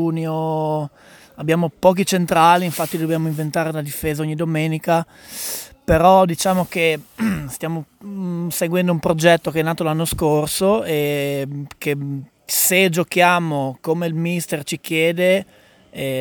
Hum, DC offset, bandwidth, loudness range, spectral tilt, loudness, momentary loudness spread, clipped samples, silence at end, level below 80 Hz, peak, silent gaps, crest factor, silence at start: none; under 0.1%; over 20 kHz; 2 LU; -5 dB/octave; -19 LUFS; 12 LU; under 0.1%; 0 s; -44 dBFS; 0 dBFS; none; 18 dB; 0 s